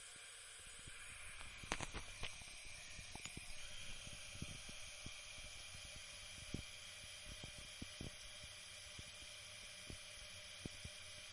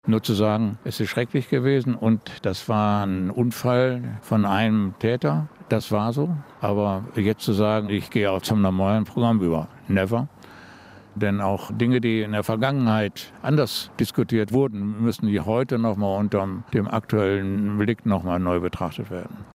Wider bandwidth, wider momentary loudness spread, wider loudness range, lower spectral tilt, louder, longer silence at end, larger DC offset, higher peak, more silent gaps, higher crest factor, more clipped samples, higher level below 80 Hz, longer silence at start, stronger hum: second, 11.5 kHz vs 16 kHz; second, 3 LU vs 6 LU; about the same, 2 LU vs 2 LU; second, -2 dB/octave vs -7 dB/octave; second, -52 LUFS vs -23 LUFS; about the same, 0 s vs 0.1 s; neither; second, -16 dBFS vs -6 dBFS; neither; first, 36 dB vs 16 dB; neither; about the same, -62 dBFS vs -58 dBFS; about the same, 0 s vs 0.05 s; neither